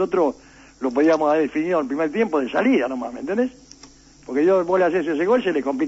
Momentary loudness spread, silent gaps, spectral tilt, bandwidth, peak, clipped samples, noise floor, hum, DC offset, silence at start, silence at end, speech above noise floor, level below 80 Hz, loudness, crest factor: 9 LU; none; -6 dB/octave; 8 kHz; -8 dBFS; under 0.1%; -48 dBFS; none; under 0.1%; 0 s; 0 s; 28 dB; -58 dBFS; -21 LUFS; 14 dB